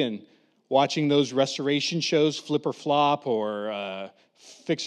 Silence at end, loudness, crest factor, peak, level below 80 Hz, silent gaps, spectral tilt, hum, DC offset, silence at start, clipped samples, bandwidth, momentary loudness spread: 0 s; -25 LUFS; 18 dB; -8 dBFS; -90 dBFS; none; -5 dB/octave; none; under 0.1%; 0 s; under 0.1%; 10.5 kHz; 12 LU